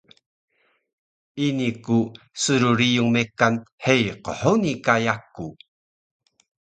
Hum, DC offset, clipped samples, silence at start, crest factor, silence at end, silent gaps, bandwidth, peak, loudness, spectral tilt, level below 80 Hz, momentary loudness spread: none; under 0.1%; under 0.1%; 1.35 s; 22 dB; 1.15 s; 3.72-3.78 s; 9.4 kHz; -2 dBFS; -21 LUFS; -5 dB/octave; -58 dBFS; 12 LU